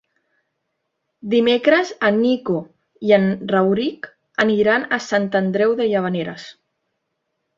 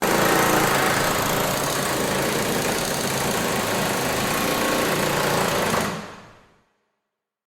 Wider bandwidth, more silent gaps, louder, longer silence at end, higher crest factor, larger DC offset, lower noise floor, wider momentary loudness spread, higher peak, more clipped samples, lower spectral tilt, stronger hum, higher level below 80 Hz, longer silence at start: second, 7.6 kHz vs over 20 kHz; neither; first, -18 LUFS vs -21 LUFS; second, 1.05 s vs 1.2 s; about the same, 18 dB vs 16 dB; neither; second, -75 dBFS vs -81 dBFS; first, 11 LU vs 4 LU; first, -2 dBFS vs -6 dBFS; neither; first, -6 dB/octave vs -3 dB/octave; neither; second, -62 dBFS vs -48 dBFS; first, 1.25 s vs 0 s